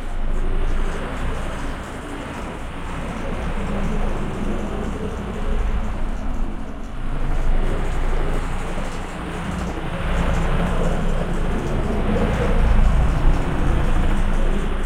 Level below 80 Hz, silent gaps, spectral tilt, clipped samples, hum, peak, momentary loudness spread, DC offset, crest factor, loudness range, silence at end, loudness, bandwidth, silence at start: -20 dBFS; none; -6.5 dB/octave; under 0.1%; none; -4 dBFS; 9 LU; under 0.1%; 14 dB; 6 LU; 0 s; -25 LUFS; 10 kHz; 0 s